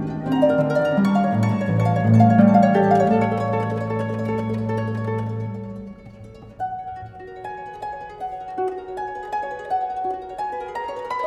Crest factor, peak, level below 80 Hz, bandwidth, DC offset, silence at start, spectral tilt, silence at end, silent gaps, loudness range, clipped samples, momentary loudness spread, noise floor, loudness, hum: 18 dB; -4 dBFS; -52 dBFS; 9 kHz; under 0.1%; 0 s; -9 dB/octave; 0 s; none; 14 LU; under 0.1%; 18 LU; -41 dBFS; -21 LUFS; none